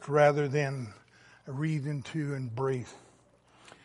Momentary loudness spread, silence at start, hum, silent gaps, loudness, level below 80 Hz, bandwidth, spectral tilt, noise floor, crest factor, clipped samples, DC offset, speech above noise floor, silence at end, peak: 19 LU; 0 s; none; none; -31 LUFS; -70 dBFS; 11.5 kHz; -7 dB/octave; -62 dBFS; 22 dB; under 0.1%; under 0.1%; 33 dB; 0.85 s; -10 dBFS